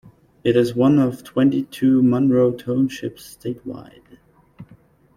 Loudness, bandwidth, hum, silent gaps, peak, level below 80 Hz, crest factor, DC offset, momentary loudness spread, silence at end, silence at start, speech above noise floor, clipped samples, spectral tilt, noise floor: -19 LUFS; 15 kHz; none; none; -4 dBFS; -56 dBFS; 16 dB; under 0.1%; 16 LU; 0.55 s; 0.45 s; 33 dB; under 0.1%; -7.5 dB/octave; -51 dBFS